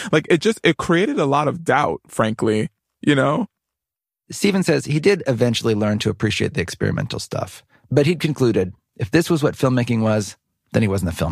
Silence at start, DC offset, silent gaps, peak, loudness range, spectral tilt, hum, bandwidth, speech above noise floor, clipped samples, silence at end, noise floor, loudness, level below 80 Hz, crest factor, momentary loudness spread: 0 s; under 0.1%; none; -2 dBFS; 2 LU; -6 dB/octave; none; 15 kHz; 69 dB; under 0.1%; 0 s; -88 dBFS; -19 LUFS; -48 dBFS; 18 dB; 8 LU